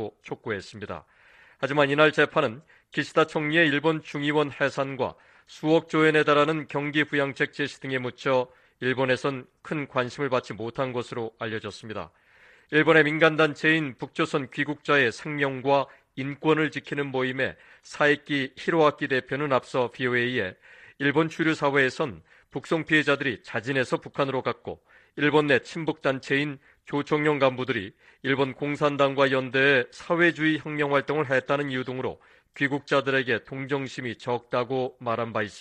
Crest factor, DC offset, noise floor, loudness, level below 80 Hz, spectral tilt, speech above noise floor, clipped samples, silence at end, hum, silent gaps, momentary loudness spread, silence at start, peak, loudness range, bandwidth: 22 dB; under 0.1%; -57 dBFS; -25 LUFS; -66 dBFS; -6 dB/octave; 31 dB; under 0.1%; 0 s; none; none; 13 LU; 0 s; -4 dBFS; 4 LU; 9.6 kHz